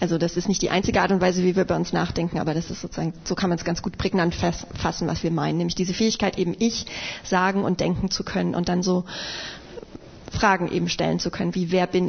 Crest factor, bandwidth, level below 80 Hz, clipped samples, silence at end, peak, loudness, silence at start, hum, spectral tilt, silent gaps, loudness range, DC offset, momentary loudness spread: 18 dB; 6.6 kHz; -44 dBFS; under 0.1%; 0 s; -6 dBFS; -24 LUFS; 0 s; none; -5 dB/octave; none; 2 LU; under 0.1%; 10 LU